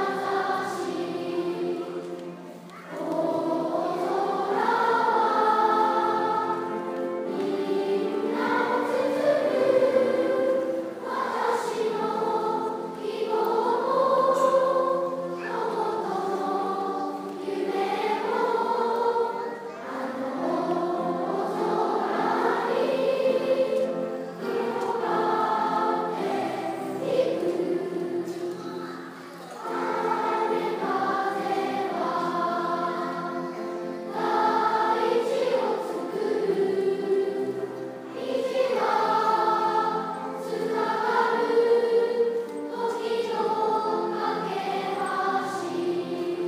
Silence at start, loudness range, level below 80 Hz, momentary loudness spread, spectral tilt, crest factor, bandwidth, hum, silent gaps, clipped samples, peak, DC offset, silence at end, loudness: 0 s; 4 LU; -82 dBFS; 10 LU; -5.5 dB/octave; 16 dB; 15.5 kHz; none; none; under 0.1%; -10 dBFS; under 0.1%; 0 s; -26 LUFS